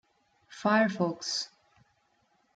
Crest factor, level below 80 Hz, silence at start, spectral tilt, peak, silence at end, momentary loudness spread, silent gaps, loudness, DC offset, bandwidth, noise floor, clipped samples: 20 dB; -78 dBFS; 0.5 s; -4 dB/octave; -12 dBFS; 1.1 s; 8 LU; none; -29 LUFS; under 0.1%; 9.2 kHz; -71 dBFS; under 0.1%